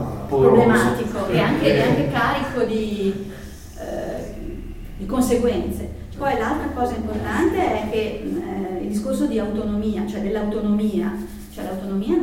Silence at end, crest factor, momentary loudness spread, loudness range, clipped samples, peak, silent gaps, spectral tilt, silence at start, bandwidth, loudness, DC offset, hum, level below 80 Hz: 0 s; 20 dB; 15 LU; 6 LU; under 0.1%; 0 dBFS; none; -6.5 dB/octave; 0 s; 16.5 kHz; -21 LUFS; under 0.1%; none; -38 dBFS